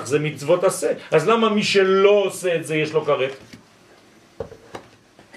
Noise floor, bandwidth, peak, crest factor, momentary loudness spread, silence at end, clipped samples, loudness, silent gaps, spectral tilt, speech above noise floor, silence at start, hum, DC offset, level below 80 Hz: -51 dBFS; 14 kHz; -2 dBFS; 18 dB; 22 LU; 0.55 s; under 0.1%; -19 LUFS; none; -4.5 dB/octave; 32 dB; 0 s; none; under 0.1%; -62 dBFS